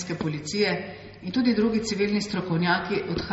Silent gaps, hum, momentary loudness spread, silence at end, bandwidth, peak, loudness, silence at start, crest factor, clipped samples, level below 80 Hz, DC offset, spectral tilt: none; none; 7 LU; 0 s; 8 kHz; -10 dBFS; -25 LUFS; 0 s; 16 dB; under 0.1%; -52 dBFS; under 0.1%; -4.5 dB/octave